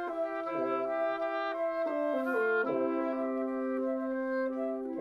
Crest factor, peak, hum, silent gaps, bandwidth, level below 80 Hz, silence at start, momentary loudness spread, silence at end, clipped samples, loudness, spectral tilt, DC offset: 12 dB; -20 dBFS; none; none; 12.5 kHz; -72 dBFS; 0 s; 4 LU; 0 s; under 0.1%; -32 LUFS; -6.5 dB/octave; under 0.1%